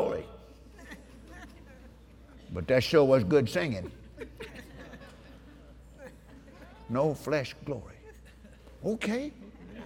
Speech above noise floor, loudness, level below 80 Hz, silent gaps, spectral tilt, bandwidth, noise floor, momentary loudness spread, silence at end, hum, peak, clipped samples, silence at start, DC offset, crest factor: 25 dB; -29 LUFS; -54 dBFS; none; -6.5 dB/octave; 17.5 kHz; -53 dBFS; 28 LU; 0 s; none; -10 dBFS; under 0.1%; 0 s; under 0.1%; 22 dB